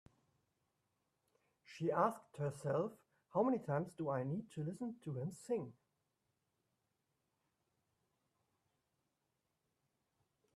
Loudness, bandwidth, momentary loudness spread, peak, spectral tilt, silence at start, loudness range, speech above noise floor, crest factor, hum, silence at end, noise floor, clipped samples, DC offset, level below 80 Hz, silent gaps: -41 LUFS; 13.5 kHz; 9 LU; -22 dBFS; -8 dB/octave; 1.7 s; 10 LU; 47 dB; 22 dB; none; 4.85 s; -87 dBFS; under 0.1%; under 0.1%; -84 dBFS; none